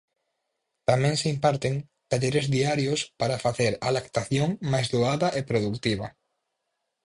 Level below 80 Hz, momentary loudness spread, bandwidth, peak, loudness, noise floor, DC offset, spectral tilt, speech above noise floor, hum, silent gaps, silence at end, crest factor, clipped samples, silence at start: -56 dBFS; 6 LU; 11.5 kHz; -6 dBFS; -26 LUFS; -80 dBFS; under 0.1%; -5.5 dB/octave; 55 dB; none; none; 0.95 s; 20 dB; under 0.1%; 0.9 s